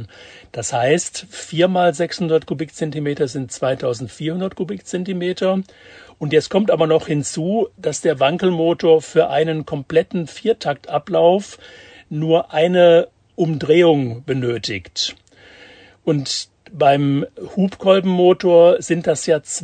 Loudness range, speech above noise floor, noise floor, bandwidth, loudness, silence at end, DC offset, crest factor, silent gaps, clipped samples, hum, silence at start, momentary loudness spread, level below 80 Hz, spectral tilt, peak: 6 LU; 28 dB; -45 dBFS; 9.4 kHz; -18 LUFS; 0 s; under 0.1%; 18 dB; none; under 0.1%; none; 0 s; 12 LU; -58 dBFS; -5.5 dB/octave; 0 dBFS